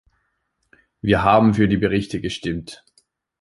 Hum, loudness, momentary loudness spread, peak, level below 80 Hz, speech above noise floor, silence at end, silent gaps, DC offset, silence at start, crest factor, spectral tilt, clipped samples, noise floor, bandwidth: none; -19 LUFS; 13 LU; -2 dBFS; -42 dBFS; 53 dB; 0.65 s; none; under 0.1%; 1.05 s; 20 dB; -7 dB/octave; under 0.1%; -71 dBFS; 11.5 kHz